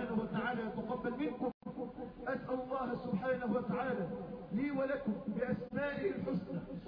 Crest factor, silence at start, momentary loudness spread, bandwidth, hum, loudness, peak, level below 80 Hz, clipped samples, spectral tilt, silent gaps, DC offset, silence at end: 16 dB; 0 s; 7 LU; 5.2 kHz; none; -39 LUFS; -24 dBFS; -64 dBFS; under 0.1%; -6.5 dB/octave; 1.54-1.61 s; under 0.1%; 0 s